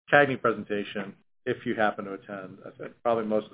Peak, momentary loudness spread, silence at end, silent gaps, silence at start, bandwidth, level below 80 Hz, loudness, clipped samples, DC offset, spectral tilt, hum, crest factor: -4 dBFS; 18 LU; 0.05 s; none; 0.1 s; 4 kHz; -68 dBFS; -28 LUFS; under 0.1%; under 0.1%; -9.5 dB/octave; none; 24 dB